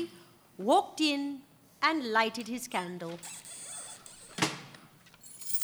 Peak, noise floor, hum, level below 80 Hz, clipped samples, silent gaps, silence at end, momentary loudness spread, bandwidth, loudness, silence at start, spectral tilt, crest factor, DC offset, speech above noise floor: -12 dBFS; -56 dBFS; none; -76 dBFS; under 0.1%; none; 0 s; 18 LU; over 20 kHz; -32 LUFS; 0 s; -3 dB/octave; 22 dB; under 0.1%; 25 dB